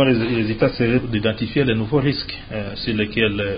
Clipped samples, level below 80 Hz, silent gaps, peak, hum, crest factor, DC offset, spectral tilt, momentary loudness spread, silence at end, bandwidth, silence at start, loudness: under 0.1%; -40 dBFS; none; -4 dBFS; none; 16 dB; under 0.1%; -11.5 dB/octave; 8 LU; 0 s; 5.2 kHz; 0 s; -20 LUFS